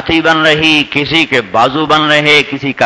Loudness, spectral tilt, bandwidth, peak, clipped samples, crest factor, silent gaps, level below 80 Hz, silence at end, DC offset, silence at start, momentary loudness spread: -9 LUFS; -4 dB/octave; 11 kHz; 0 dBFS; 1%; 10 dB; none; -40 dBFS; 0 s; under 0.1%; 0 s; 4 LU